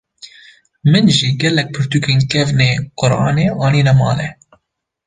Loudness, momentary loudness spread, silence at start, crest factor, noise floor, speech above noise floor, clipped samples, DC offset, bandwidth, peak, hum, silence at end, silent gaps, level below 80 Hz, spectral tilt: -14 LUFS; 6 LU; 0.25 s; 14 dB; -68 dBFS; 55 dB; under 0.1%; under 0.1%; 9.6 kHz; 0 dBFS; none; 0.75 s; none; -44 dBFS; -5.5 dB/octave